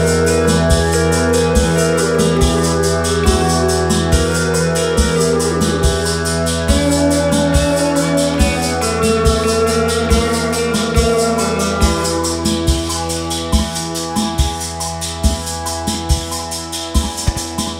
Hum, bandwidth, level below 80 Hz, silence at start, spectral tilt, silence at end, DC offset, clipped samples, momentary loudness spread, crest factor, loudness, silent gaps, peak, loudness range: none; 16 kHz; -22 dBFS; 0 s; -4.5 dB/octave; 0 s; under 0.1%; under 0.1%; 6 LU; 14 dB; -15 LUFS; none; 0 dBFS; 5 LU